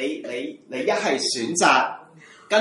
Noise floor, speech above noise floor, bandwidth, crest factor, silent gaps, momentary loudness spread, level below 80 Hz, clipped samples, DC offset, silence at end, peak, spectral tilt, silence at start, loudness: -48 dBFS; 25 dB; 11.5 kHz; 20 dB; none; 14 LU; -72 dBFS; under 0.1%; under 0.1%; 0 s; -2 dBFS; -2 dB/octave; 0 s; -22 LUFS